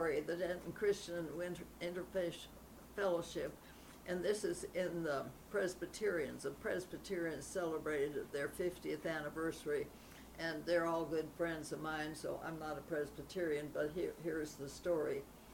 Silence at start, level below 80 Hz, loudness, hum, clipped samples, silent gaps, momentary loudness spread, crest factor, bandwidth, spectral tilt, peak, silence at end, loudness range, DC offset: 0 s; -64 dBFS; -42 LUFS; none; under 0.1%; none; 7 LU; 16 dB; 19 kHz; -5 dB/octave; -24 dBFS; 0 s; 1 LU; under 0.1%